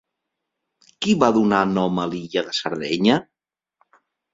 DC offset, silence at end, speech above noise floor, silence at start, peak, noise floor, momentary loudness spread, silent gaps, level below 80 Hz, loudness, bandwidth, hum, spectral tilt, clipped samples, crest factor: under 0.1%; 1.1 s; 61 dB; 1 s; -2 dBFS; -80 dBFS; 8 LU; none; -58 dBFS; -20 LUFS; 7.8 kHz; none; -5.5 dB/octave; under 0.1%; 20 dB